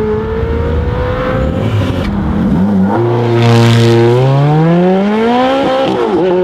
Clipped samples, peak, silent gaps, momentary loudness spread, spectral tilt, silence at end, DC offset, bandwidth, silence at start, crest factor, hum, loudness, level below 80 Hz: under 0.1%; 0 dBFS; none; 7 LU; -7.5 dB/octave; 0 s; under 0.1%; 11.5 kHz; 0 s; 10 dB; none; -11 LUFS; -24 dBFS